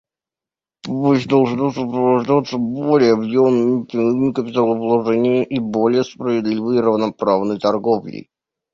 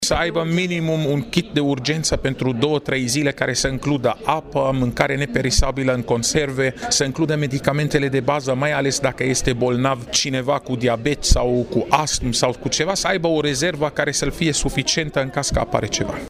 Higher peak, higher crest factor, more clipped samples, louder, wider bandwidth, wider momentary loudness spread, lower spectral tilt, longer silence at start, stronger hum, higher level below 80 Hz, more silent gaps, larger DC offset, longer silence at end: about the same, -2 dBFS vs -2 dBFS; about the same, 14 dB vs 16 dB; neither; first, -17 LUFS vs -20 LUFS; second, 7.4 kHz vs 15.5 kHz; first, 6 LU vs 3 LU; first, -7.5 dB/octave vs -4 dB/octave; first, 0.85 s vs 0 s; neither; second, -58 dBFS vs -32 dBFS; neither; neither; first, 0.55 s vs 0 s